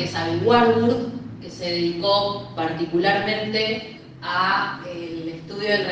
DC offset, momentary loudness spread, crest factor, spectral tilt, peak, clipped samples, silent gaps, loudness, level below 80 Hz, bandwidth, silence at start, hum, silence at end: under 0.1%; 14 LU; 20 dB; -5.5 dB/octave; -2 dBFS; under 0.1%; none; -22 LUFS; -56 dBFS; 8.8 kHz; 0 s; none; 0 s